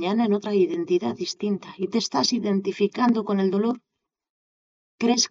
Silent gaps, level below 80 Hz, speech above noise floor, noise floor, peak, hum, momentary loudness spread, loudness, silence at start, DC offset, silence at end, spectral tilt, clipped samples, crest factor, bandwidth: 4.30-4.98 s; -74 dBFS; over 67 dB; under -90 dBFS; -10 dBFS; none; 7 LU; -24 LUFS; 0 s; under 0.1%; 0.05 s; -4.5 dB/octave; under 0.1%; 14 dB; 7.8 kHz